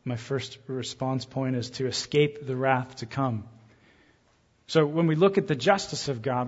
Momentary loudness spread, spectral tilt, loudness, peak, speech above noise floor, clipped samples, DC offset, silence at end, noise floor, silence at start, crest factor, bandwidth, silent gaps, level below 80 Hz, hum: 10 LU; -5.5 dB/octave; -27 LUFS; -6 dBFS; 38 dB; under 0.1%; under 0.1%; 0 s; -65 dBFS; 0.05 s; 22 dB; 8 kHz; none; -64 dBFS; none